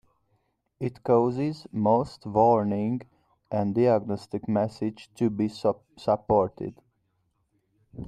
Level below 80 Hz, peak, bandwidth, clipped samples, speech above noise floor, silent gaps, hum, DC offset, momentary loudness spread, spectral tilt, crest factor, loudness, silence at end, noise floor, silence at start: -58 dBFS; -8 dBFS; 10.5 kHz; under 0.1%; 48 dB; none; none; under 0.1%; 11 LU; -8.5 dB/octave; 20 dB; -26 LUFS; 0 s; -73 dBFS; 0.8 s